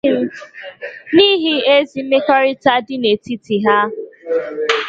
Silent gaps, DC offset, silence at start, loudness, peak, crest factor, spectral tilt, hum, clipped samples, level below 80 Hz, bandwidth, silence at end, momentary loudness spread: none; under 0.1%; 0.05 s; -15 LUFS; 0 dBFS; 16 dB; -5 dB/octave; none; under 0.1%; -60 dBFS; 7.8 kHz; 0 s; 18 LU